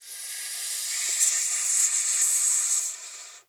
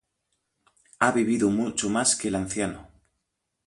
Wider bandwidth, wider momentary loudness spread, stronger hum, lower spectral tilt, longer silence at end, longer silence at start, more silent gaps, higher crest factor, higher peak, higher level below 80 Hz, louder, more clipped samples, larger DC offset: first, over 20 kHz vs 11.5 kHz; first, 12 LU vs 8 LU; neither; second, 6.5 dB/octave vs -3.5 dB/octave; second, 0.1 s vs 0.8 s; second, 0 s vs 1 s; neither; second, 18 dB vs 24 dB; second, -8 dBFS vs -4 dBFS; second, under -90 dBFS vs -56 dBFS; about the same, -23 LUFS vs -25 LUFS; neither; neither